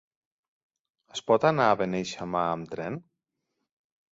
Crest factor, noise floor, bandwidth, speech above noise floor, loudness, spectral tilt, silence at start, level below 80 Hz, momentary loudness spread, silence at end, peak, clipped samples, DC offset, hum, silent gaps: 22 dB; -82 dBFS; 8 kHz; 56 dB; -27 LUFS; -5.5 dB/octave; 1.15 s; -64 dBFS; 15 LU; 1.15 s; -8 dBFS; under 0.1%; under 0.1%; none; none